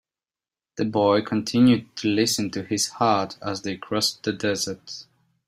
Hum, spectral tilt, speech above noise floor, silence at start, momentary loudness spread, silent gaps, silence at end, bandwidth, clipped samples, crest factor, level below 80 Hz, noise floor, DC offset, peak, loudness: none; -4 dB/octave; over 67 dB; 0.75 s; 11 LU; none; 0.45 s; 16 kHz; under 0.1%; 18 dB; -62 dBFS; under -90 dBFS; under 0.1%; -6 dBFS; -23 LUFS